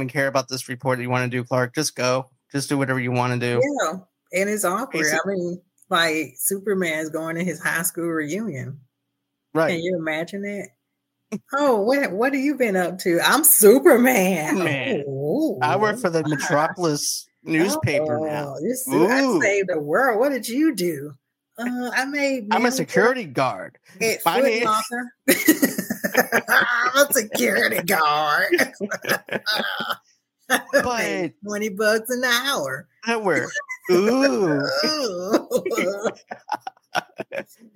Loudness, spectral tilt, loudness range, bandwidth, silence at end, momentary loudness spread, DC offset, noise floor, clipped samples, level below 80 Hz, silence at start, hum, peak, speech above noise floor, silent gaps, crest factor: -21 LUFS; -3.5 dB/octave; 7 LU; 17 kHz; 0.35 s; 11 LU; under 0.1%; -78 dBFS; under 0.1%; -68 dBFS; 0 s; none; -2 dBFS; 57 dB; none; 20 dB